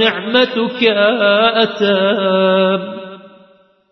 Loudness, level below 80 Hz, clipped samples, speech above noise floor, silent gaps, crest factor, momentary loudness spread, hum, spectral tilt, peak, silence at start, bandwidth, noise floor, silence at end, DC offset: -13 LUFS; -64 dBFS; under 0.1%; 36 dB; none; 14 dB; 9 LU; none; -6.5 dB/octave; 0 dBFS; 0 s; 6.2 kHz; -50 dBFS; 0.65 s; under 0.1%